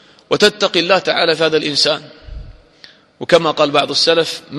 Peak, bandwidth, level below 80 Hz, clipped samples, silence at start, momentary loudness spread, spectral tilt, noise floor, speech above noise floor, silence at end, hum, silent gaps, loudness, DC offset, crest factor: 0 dBFS; 12.5 kHz; -42 dBFS; under 0.1%; 0.3 s; 4 LU; -3 dB/octave; -45 dBFS; 30 dB; 0 s; none; none; -14 LUFS; under 0.1%; 16 dB